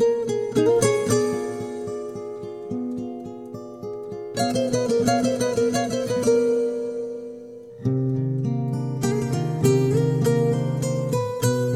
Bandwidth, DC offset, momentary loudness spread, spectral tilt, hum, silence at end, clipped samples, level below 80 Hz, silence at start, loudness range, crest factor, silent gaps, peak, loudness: 15.5 kHz; under 0.1%; 14 LU; -6 dB/octave; none; 0 s; under 0.1%; -56 dBFS; 0 s; 6 LU; 18 dB; none; -6 dBFS; -23 LUFS